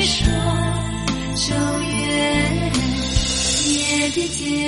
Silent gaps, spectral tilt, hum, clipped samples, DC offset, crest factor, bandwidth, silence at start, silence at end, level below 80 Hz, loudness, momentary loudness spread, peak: none; -3.5 dB/octave; none; under 0.1%; under 0.1%; 16 dB; 11.5 kHz; 0 s; 0 s; -30 dBFS; -19 LUFS; 5 LU; -4 dBFS